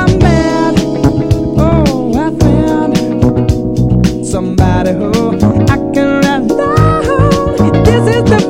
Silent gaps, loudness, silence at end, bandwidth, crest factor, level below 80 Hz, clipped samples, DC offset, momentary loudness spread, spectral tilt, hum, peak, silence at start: none; -11 LUFS; 0 s; 16 kHz; 10 dB; -22 dBFS; 0.3%; under 0.1%; 4 LU; -7 dB/octave; none; 0 dBFS; 0 s